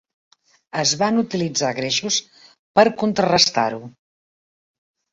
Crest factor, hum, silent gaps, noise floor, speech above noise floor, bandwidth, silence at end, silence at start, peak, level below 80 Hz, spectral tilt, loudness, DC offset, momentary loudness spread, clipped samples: 20 dB; none; 2.59-2.74 s; under -90 dBFS; over 71 dB; 8 kHz; 1.25 s; 0.75 s; -2 dBFS; -60 dBFS; -3 dB/octave; -19 LUFS; under 0.1%; 7 LU; under 0.1%